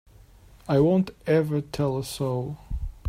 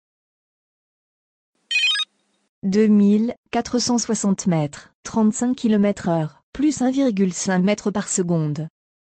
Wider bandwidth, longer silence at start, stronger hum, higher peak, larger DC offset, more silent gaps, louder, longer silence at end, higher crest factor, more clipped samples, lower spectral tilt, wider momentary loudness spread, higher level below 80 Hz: first, 16 kHz vs 9.6 kHz; second, 0.65 s vs 1.7 s; neither; about the same, -10 dBFS vs -8 dBFS; neither; second, none vs 2.49-2.62 s, 3.38-3.43 s, 4.94-5.03 s, 6.43-6.53 s; second, -25 LUFS vs -20 LUFS; second, 0 s vs 0.45 s; about the same, 16 dB vs 14 dB; neither; first, -7.5 dB/octave vs -4.5 dB/octave; first, 14 LU vs 10 LU; first, -42 dBFS vs -56 dBFS